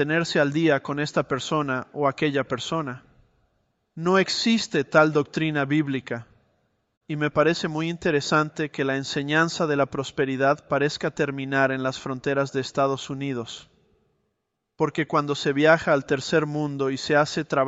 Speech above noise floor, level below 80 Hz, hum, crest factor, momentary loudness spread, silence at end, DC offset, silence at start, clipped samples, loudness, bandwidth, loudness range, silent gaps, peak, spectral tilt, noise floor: 55 dB; -60 dBFS; none; 20 dB; 9 LU; 0 s; under 0.1%; 0 s; under 0.1%; -24 LUFS; 8.2 kHz; 4 LU; 6.97-7.01 s; -4 dBFS; -5 dB/octave; -78 dBFS